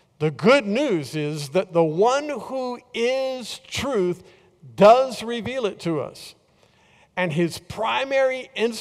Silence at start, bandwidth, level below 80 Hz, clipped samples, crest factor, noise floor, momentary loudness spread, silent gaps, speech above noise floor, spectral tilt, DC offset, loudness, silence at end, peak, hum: 0.2 s; 15 kHz; -58 dBFS; under 0.1%; 18 dB; -59 dBFS; 12 LU; none; 37 dB; -5.5 dB/octave; under 0.1%; -22 LUFS; 0 s; -4 dBFS; none